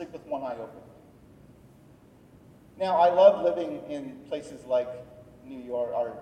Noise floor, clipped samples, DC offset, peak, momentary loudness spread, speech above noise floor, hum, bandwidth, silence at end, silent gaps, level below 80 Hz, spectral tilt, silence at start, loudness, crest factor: -55 dBFS; under 0.1%; under 0.1%; -6 dBFS; 21 LU; 29 dB; none; 9.2 kHz; 0 s; none; -66 dBFS; -6 dB/octave; 0 s; -26 LUFS; 22 dB